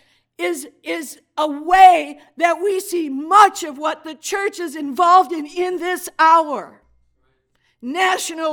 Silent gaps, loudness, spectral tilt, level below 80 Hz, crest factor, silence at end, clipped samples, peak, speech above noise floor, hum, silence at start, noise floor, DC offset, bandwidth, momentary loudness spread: none; -17 LUFS; -1 dB/octave; -56 dBFS; 18 dB; 0 s; under 0.1%; 0 dBFS; 48 dB; none; 0.4 s; -65 dBFS; under 0.1%; 18 kHz; 16 LU